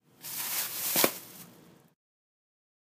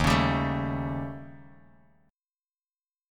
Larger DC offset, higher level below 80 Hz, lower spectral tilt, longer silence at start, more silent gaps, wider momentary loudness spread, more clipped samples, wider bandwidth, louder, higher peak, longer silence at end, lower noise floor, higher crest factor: neither; second, -84 dBFS vs -42 dBFS; second, -1 dB/octave vs -6 dB/octave; first, 0.2 s vs 0 s; neither; about the same, 20 LU vs 19 LU; neither; second, 15.5 kHz vs 17.5 kHz; about the same, -29 LUFS vs -28 LUFS; about the same, -6 dBFS vs -8 dBFS; second, 1.4 s vs 1.6 s; second, -57 dBFS vs under -90 dBFS; first, 30 dB vs 22 dB